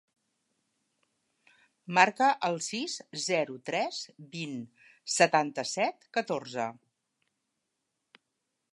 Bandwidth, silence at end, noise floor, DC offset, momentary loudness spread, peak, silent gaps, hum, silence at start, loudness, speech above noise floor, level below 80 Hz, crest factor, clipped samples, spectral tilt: 11.5 kHz; 2 s; -83 dBFS; under 0.1%; 15 LU; -6 dBFS; none; none; 1.9 s; -29 LUFS; 53 dB; -86 dBFS; 26 dB; under 0.1%; -3 dB/octave